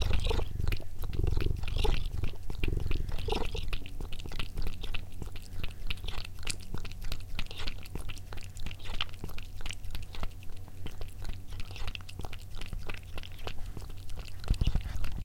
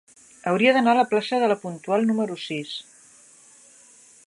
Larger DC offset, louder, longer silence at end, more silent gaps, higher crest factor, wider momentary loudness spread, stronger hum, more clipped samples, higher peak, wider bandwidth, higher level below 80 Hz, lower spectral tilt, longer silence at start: neither; second, -39 LUFS vs -22 LUFS; second, 0 s vs 1.45 s; neither; about the same, 18 dB vs 20 dB; about the same, 11 LU vs 13 LU; neither; neither; second, -12 dBFS vs -4 dBFS; first, 15.5 kHz vs 11.5 kHz; first, -34 dBFS vs -76 dBFS; about the same, -5 dB/octave vs -5 dB/octave; second, 0 s vs 0.45 s